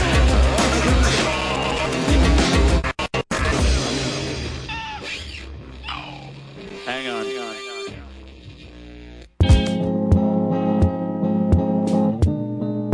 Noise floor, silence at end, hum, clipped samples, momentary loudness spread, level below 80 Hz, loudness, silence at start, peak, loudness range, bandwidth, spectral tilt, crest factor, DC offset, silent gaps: -40 dBFS; 0 s; none; under 0.1%; 20 LU; -26 dBFS; -20 LUFS; 0 s; -4 dBFS; 11 LU; 11 kHz; -5.5 dB/octave; 16 dB; under 0.1%; none